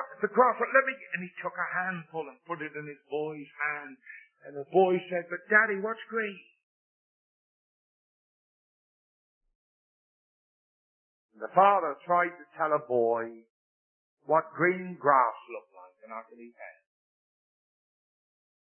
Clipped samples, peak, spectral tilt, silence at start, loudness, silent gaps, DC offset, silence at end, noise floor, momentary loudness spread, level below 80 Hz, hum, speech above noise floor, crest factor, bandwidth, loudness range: under 0.1%; -8 dBFS; -9.5 dB/octave; 0 s; -28 LUFS; 6.63-9.41 s, 9.55-11.29 s, 13.50-14.17 s; under 0.1%; 2.1 s; under -90 dBFS; 21 LU; under -90 dBFS; none; over 61 dB; 24 dB; 3.3 kHz; 7 LU